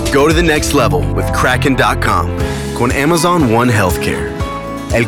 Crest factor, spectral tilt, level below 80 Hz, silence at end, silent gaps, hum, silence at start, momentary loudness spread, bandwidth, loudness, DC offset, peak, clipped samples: 10 dB; -5 dB/octave; -24 dBFS; 0 s; none; none; 0 s; 8 LU; 18 kHz; -13 LUFS; under 0.1%; -2 dBFS; under 0.1%